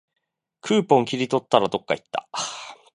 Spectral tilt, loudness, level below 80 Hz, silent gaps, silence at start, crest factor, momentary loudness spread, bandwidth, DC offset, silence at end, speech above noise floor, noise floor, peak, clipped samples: -4.5 dB/octave; -23 LUFS; -68 dBFS; none; 0.65 s; 24 dB; 12 LU; 10.5 kHz; under 0.1%; 0.2 s; 28 dB; -50 dBFS; 0 dBFS; under 0.1%